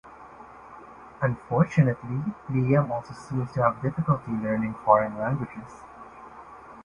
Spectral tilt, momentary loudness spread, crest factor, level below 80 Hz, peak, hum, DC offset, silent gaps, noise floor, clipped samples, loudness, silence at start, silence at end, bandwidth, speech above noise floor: -9.5 dB/octave; 24 LU; 22 dB; -56 dBFS; -4 dBFS; none; under 0.1%; none; -46 dBFS; under 0.1%; -26 LUFS; 0.05 s; 0 s; 10 kHz; 21 dB